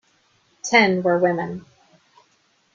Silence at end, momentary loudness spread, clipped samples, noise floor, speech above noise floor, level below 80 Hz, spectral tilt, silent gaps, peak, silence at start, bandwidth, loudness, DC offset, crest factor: 1.15 s; 17 LU; under 0.1%; -63 dBFS; 44 dB; -66 dBFS; -4.5 dB/octave; none; -2 dBFS; 0.65 s; 7.6 kHz; -19 LUFS; under 0.1%; 20 dB